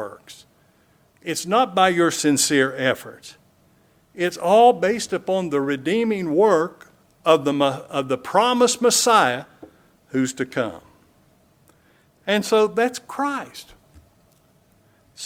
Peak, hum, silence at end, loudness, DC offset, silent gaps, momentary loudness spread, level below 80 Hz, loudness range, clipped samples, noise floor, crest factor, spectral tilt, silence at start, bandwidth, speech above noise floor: -2 dBFS; none; 0 s; -20 LUFS; under 0.1%; none; 13 LU; -64 dBFS; 6 LU; under 0.1%; -59 dBFS; 20 dB; -3.5 dB/octave; 0 s; 17.5 kHz; 39 dB